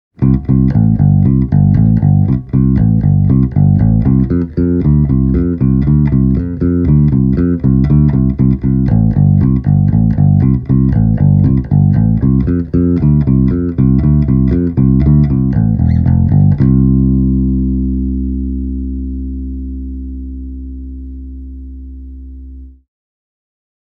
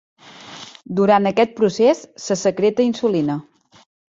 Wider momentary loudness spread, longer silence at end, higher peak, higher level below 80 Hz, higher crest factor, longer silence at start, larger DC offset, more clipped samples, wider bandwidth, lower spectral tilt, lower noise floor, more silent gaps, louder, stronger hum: second, 15 LU vs 20 LU; first, 1.1 s vs 0.75 s; about the same, 0 dBFS vs -2 dBFS; first, -20 dBFS vs -62 dBFS; second, 10 dB vs 18 dB; about the same, 0.2 s vs 0.25 s; neither; neither; second, 2.5 kHz vs 8 kHz; first, -13.5 dB/octave vs -5.5 dB/octave; second, -31 dBFS vs -39 dBFS; neither; first, -11 LUFS vs -18 LUFS; neither